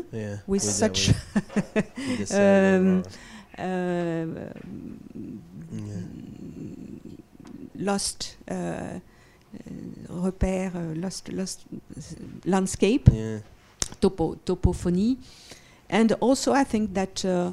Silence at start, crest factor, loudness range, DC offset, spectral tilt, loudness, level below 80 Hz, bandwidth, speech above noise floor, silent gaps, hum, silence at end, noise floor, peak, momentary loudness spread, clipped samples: 0 s; 26 dB; 10 LU; under 0.1%; -5.5 dB/octave; -25 LUFS; -42 dBFS; 13.5 kHz; 20 dB; none; none; 0 s; -45 dBFS; 0 dBFS; 20 LU; under 0.1%